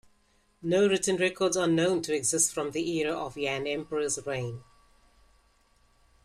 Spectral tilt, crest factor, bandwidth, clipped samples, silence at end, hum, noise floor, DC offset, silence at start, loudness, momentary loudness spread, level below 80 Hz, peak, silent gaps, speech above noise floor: -3.5 dB/octave; 18 dB; 14.5 kHz; under 0.1%; 1.6 s; none; -67 dBFS; under 0.1%; 0.6 s; -28 LUFS; 9 LU; -62 dBFS; -12 dBFS; none; 39 dB